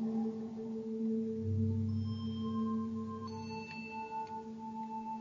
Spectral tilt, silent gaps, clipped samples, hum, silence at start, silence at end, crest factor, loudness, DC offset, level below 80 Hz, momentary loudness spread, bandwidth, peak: -7.5 dB/octave; none; under 0.1%; none; 0 s; 0 s; 14 dB; -39 LUFS; under 0.1%; -70 dBFS; 8 LU; 7.4 kHz; -24 dBFS